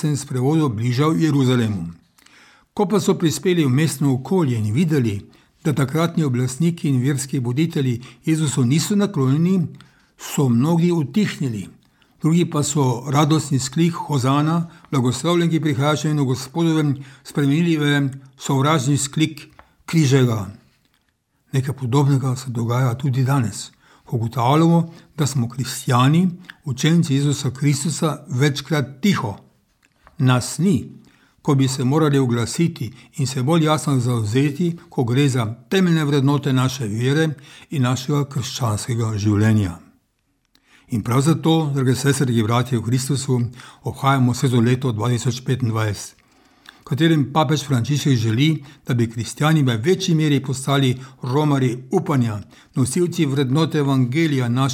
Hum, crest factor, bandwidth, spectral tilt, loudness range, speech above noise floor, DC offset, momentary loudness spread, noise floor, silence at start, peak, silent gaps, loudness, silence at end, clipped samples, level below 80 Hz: none; 18 dB; 16 kHz; -6 dB/octave; 2 LU; 49 dB; under 0.1%; 8 LU; -67 dBFS; 0 s; -2 dBFS; none; -20 LUFS; 0 s; under 0.1%; -58 dBFS